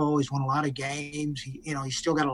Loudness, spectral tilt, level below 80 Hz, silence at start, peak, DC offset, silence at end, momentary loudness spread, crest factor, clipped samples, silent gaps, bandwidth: -29 LUFS; -5 dB/octave; -58 dBFS; 0 s; -12 dBFS; under 0.1%; 0 s; 7 LU; 16 dB; under 0.1%; none; 12 kHz